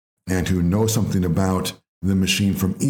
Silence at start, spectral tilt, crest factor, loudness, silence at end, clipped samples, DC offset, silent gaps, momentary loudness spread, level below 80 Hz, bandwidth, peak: 0.25 s; -5.5 dB/octave; 14 dB; -21 LUFS; 0 s; under 0.1%; under 0.1%; 1.88-2.01 s; 6 LU; -46 dBFS; 18 kHz; -6 dBFS